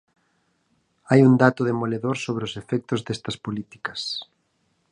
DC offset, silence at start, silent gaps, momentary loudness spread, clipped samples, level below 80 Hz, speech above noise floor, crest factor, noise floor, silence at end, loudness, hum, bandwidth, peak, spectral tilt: under 0.1%; 1.1 s; none; 15 LU; under 0.1%; -62 dBFS; 47 dB; 22 dB; -69 dBFS; 0.7 s; -23 LUFS; none; 10.5 kHz; 0 dBFS; -6.5 dB/octave